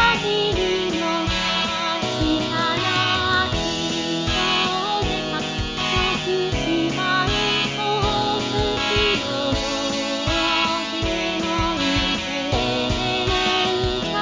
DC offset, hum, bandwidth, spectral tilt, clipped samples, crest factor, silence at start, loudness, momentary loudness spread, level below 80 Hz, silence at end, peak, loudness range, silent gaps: under 0.1%; none; 7.6 kHz; -4 dB/octave; under 0.1%; 16 dB; 0 s; -21 LUFS; 4 LU; -36 dBFS; 0 s; -6 dBFS; 1 LU; none